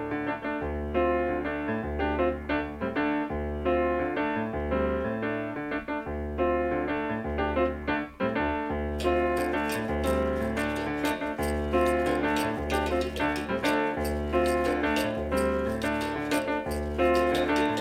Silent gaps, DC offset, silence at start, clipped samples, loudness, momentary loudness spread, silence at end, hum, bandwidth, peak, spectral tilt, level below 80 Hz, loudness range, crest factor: none; under 0.1%; 0 s; under 0.1%; -28 LUFS; 6 LU; 0 s; none; 16 kHz; -12 dBFS; -6 dB/octave; -40 dBFS; 2 LU; 16 dB